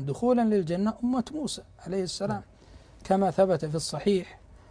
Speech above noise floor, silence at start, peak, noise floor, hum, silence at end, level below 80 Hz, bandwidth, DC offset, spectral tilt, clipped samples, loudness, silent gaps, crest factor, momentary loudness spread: 24 dB; 0 s; -10 dBFS; -51 dBFS; none; 0.15 s; -54 dBFS; 10.5 kHz; under 0.1%; -6 dB/octave; under 0.1%; -28 LUFS; none; 18 dB; 11 LU